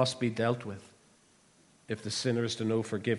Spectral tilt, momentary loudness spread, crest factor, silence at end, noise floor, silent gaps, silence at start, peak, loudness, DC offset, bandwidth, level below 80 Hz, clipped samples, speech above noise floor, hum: -5 dB/octave; 11 LU; 20 dB; 0 s; -64 dBFS; none; 0 s; -14 dBFS; -32 LUFS; under 0.1%; 11.5 kHz; -72 dBFS; under 0.1%; 33 dB; none